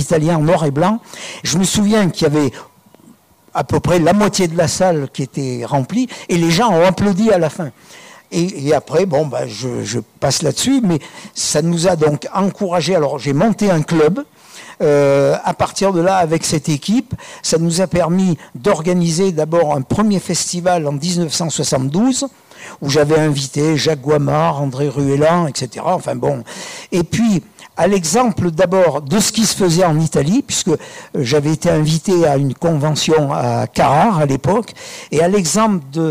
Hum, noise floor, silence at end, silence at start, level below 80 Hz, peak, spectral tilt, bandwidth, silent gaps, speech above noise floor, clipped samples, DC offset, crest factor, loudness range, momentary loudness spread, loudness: none; -47 dBFS; 0 s; 0 s; -46 dBFS; -6 dBFS; -5 dB/octave; 16 kHz; none; 32 dB; under 0.1%; under 0.1%; 10 dB; 2 LU; 9 LU; -15 LUFS